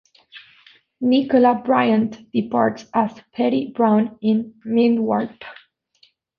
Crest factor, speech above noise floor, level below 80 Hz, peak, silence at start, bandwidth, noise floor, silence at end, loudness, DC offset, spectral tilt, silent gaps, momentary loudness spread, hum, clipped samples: 18 dB; 40 dB; -64 dBFS; -2 dBFS; 0.35 s; 6.6 kHz; -59 dBFS; 0.85 s; -19 LUFS; under 0.1%; -7.5 dB/octave; none; 9 LU; none; under 0.1%